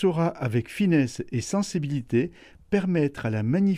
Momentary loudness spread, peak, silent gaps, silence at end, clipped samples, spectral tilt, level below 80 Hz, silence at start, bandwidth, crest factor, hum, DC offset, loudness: 5 LU; -10 dBFS; none; 0 s; under 0.1%; -7 dB/octave; -56 dBFS; 0 s; 12.5 kHz; 16 dB; none; under 0.1%; -26 LUFS